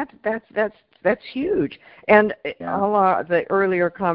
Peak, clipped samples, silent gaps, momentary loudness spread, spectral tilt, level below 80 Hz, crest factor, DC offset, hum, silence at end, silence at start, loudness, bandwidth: -2 dBFS; under 0.1%; none; 11 LU; -10.5 dB/octave; -56 dBFS; 20 dB; under 0.1%; none; 0 s; 0 s; -21 LUFS; 5.4 kHz